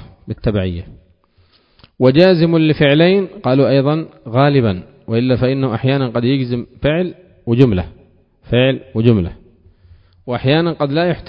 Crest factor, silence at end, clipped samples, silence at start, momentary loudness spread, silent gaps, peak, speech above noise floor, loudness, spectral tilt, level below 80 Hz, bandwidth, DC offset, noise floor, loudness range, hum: 16 dB; 0.05 s; under 0.1%; 0.25 s; 11 LU; none; 0 dBFS; 40 dB; -15 LUFS; -9.5 dB/octave; -38 dBFS; 5.4 kHz; under 0.1%; -54 dBFS; 4 LU; none